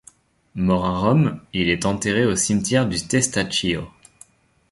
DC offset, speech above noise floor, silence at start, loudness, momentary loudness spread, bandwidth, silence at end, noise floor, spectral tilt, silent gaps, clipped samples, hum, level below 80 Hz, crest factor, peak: under 0.1%; 32 dB; 0.55 s; -20 LUFS; 6 LU; 11.5 kHz; 0.85 s; -52 dBFS; -4.5 dB/octave; none; under 0.1%; none; -44 dBFS; 18 dB; -4 dBFS